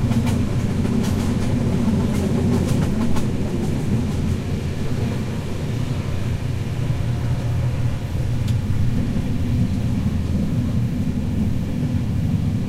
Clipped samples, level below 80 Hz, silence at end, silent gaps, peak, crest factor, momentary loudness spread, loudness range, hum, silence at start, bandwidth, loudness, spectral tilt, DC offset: under 0.1%; -30 dBFS; 0 s; none; -6 dBFS; 14 dB; 5 LU; 3 LU; none; 0 s; 15 kHz; -22 LUFS; -7.5 dB/octave; under 0.1%